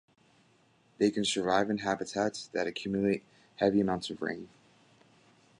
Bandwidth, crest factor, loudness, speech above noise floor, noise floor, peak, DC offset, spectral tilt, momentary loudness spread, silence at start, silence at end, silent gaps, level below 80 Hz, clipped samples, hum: 11 kHz; 20 dB; -31 LUFS; 36 dB; -66 dBFS; -12 dBFS; under 0.1%; -4.5 dB/octave; 9 LU; 1 s; 1.15 s; none; -66 dBFS; under 0.1%; none